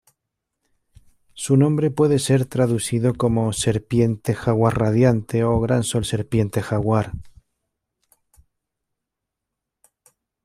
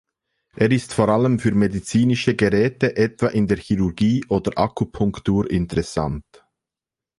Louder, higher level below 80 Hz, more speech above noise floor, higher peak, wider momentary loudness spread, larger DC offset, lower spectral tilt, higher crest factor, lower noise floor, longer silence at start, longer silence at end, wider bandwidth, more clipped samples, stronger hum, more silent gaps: about the same, -20 LUFS vs -20 LUFS; about the same, -46 dBFS vs -42 dBFS; second, 64 dB vs 69 dB; about the same, -4 dBFS vs -4 dBFS; about the same, 5 LU vs 5 LU; neither; about the same, -6.5 dB/octave vs -7 dB/octave; about the same, 18 dB vs 18 dB; second, -83 dBFS vs -89 dBFS; first, 1.35 s vs 0.55 s; first, 3.15 s vs 0.95 s; first, 13.5 kHz vs 11.5 kHz; neither; neither; neither